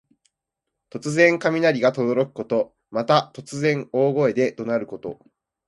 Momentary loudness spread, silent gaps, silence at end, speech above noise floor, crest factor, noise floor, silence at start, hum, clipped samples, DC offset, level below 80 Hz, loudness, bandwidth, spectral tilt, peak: 15 LU; none; 0.55 s; 62 dB; 20 dB; -83 dBFS; 0.95 s; none; under 0.1%; under 0.1%; -66 dBFS; -21 LUFS; 11.5 kHz; -6 dB/octave; -2 dBFS